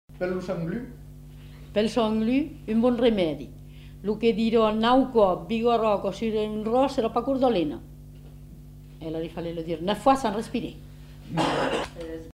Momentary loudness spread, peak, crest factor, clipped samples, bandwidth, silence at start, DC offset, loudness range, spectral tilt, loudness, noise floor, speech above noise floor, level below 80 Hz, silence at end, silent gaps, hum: 24 LU; -6 dBFS; 18 dB; under 0.1%; 15.5 kHz; 0.1 s; under 0.1%; 6 LU; -6 dB/octave; -25 LUFS; -44 dBFS; 20 dB; -48 dBFS; 0.05 s; none; 50 Hz at -50 dBFS